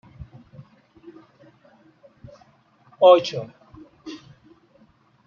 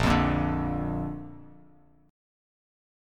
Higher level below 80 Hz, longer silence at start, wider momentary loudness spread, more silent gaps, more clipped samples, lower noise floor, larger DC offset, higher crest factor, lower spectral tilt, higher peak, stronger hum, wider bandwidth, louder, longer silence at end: second, -60 dBFS vs -40 dBFS; first, 0.2 s vs 0 s; first, 29 LU vs 20 LU; neither; neither; about the same, -58 dBFS vs -58 dBFS; neither; about the same, 24 dB vs 22 dB; second, -3.5 dB/octave vs -7 dB/octave; first, -2 dBFS vs -8 dBFS; neither; second, 7.2 kHz vs 14.5 kHz; first, -17 LUFS vs -28 LUFS; about the same, 1.1 s vs 1 s